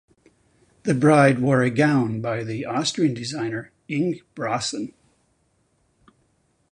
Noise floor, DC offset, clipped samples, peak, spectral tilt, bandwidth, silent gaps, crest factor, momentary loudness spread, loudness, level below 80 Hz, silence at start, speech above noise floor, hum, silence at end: -66 dBFS; under 0.1%; under 0.1%; -2 dBFS; -5.5 dB/octave; 10.5 kHz; none; 20 dB; 13 LU; -22 LUFS; -60 dBFS; 0.85 s; 45 dB; none; 1.8 s